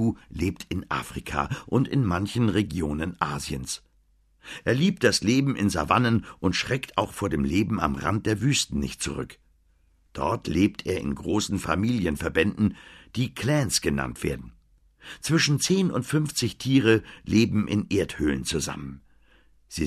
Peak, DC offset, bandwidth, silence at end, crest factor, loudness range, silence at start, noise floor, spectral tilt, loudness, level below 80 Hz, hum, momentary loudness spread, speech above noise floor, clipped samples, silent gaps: -4 dBFS; under 0.1%; 14 kHz; 0 s; 20 dB; 4 LU; 0 s; -63 dBFS; -5 dB/octave; -25 LUFS; -44 dBFS; none; 10 LU; 38 dB; under 0.1%; none